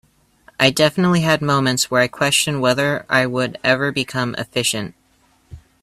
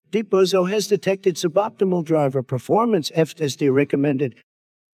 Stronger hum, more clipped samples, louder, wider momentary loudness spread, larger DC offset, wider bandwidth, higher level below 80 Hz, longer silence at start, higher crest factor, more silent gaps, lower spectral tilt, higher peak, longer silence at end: neither; neither; first, -17 LUFS vs -20 LUFS; about the same, 6 LU vs 4 LU; neither; about the same, 16 kHz vs 16 kHz; first, -52 dBFS vs -70 dBFS; first, 0.6 s vs 0.15 s; about the same, 20 dB vs 16 dB; neither; second, -4 dB/octave vs -6 dB/octave; first, 0 dBFS vs -4 dBFS; second, 0.25 s vs 0.6 s